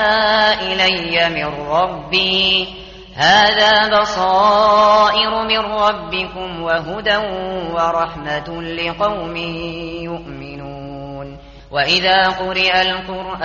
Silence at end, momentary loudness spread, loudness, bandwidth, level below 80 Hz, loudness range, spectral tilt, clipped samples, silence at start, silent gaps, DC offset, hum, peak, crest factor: 0 s; 18 LU; -15 LUFS; 7.2 kHz; -42 dBFS; 10 LU; -0.5 dB/octave; under 0.1%; 0 s; none; under 0.1%; none; -2 dBFS; 16 dB